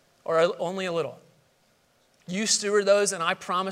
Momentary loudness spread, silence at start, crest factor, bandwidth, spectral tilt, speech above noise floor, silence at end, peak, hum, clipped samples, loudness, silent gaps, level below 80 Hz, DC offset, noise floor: 9 LU; 0.25 s; 20 dB; 15.5 kHz; -2.5 dB/octave; 40 dB; 0 s; -8 dBFS; none; under 0.1%; -25 LUFS; none; -78 dBFS; under 0.1%; -65 dBFS